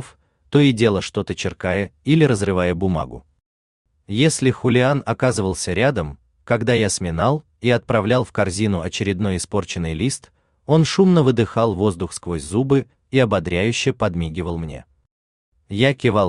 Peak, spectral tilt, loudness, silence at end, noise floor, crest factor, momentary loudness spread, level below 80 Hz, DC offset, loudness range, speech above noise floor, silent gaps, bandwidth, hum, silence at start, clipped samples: -2 dBFS; -5.5 dB/octave; -19 LUFS; 0 s; -48 dBFS; 16 dB; 10 LU; -46 dBFS; under 0.1%; 3 LU; 30 dB; 3.46-3.85 s, 15.11-15.52 s; 12.5 kHz; none; 0 s; under 0.1%